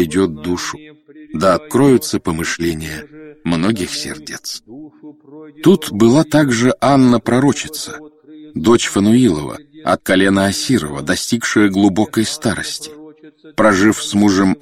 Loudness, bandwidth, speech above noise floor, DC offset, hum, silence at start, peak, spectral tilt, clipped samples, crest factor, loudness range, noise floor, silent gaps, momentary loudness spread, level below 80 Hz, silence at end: -15 LUFS; 16 kHz; 26 dB; under 0.1%; none; 0 s; 0 dBFS; -5 dB/octave; under 0.1%; 16 dB; 5 LU; -41 dBFS; none; 15 LU; -44 dBFS; 0.05 s